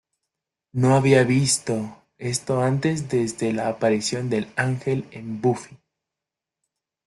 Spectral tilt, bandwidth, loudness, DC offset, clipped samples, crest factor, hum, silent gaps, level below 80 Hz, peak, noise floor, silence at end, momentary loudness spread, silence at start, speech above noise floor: -5 dB/octave; 12.5 kHz; -22 LUFS; under 0.1%; under 0.1%; 18 dB; none; none; -60 dBFS; -4 dBFS; -87 dBFS; 1.35 s; 12 LU; 0.75 s; 65 dB